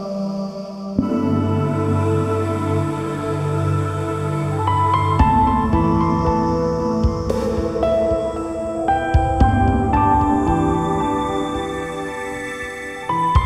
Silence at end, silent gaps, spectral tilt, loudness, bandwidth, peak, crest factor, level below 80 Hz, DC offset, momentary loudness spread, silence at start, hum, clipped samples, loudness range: 0 s; none; -7.5 dB/octave; -19 LUFS; 12 kHz; -2 dBFS; 16 dB; -28 dBFS; under 0.1%; 10 LU; 0 s; none; under 0.1%; 3 LU